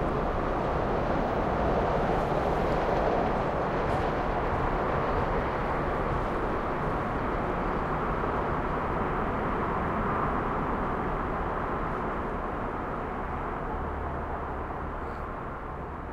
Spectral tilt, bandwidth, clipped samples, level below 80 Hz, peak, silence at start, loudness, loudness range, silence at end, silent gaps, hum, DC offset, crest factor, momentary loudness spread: -8 dB/octave; 11 kHz; under 0.1%; -38 dBFS; -14 dBFS; 0 s; -30 LUFS; 5 LU; 0 s; none; none; under 0.1%; 14 dB; 7 LU